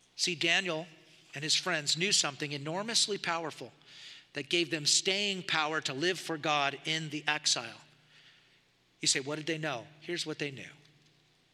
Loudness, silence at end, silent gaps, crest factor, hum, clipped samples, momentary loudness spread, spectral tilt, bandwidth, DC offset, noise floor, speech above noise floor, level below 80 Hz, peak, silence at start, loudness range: -30 LUFS; 0.8 s; none; 24 dB; 60 Hz at -70 dBFS; under 0.1%; 18 LU; -1.5 dB/octave; 15 kHz; under 0.1%; -68 dBFS; 35 dB; -86 dBFS; -10 dBFS; 0.15 s; 6 LU